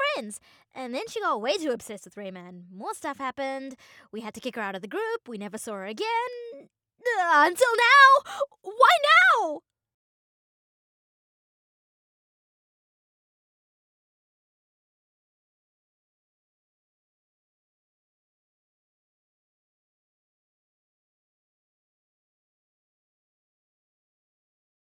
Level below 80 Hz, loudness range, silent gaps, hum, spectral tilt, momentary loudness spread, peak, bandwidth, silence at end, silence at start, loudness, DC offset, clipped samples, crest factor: -82 dBFS; 15 LU; none; none; -2 dB/octave; 23 LU; -4 dBFS; 19 kHz; 15.25 s; 0 s; -22 LUFS; under 0.1%; under 0.1%; 24 dB